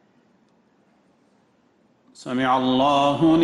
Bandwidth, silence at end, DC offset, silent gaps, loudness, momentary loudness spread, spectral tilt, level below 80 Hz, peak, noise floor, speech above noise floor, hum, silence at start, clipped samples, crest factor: 10.5 kHz; 0 s; under 0.1%; none; -20 LUFS; 11 LU; -6 dB/octave; -58 dBFS; -8 dBFS; -61 dBFS; 42 dB; none; 2.2 s; under 0.1%; 14 dB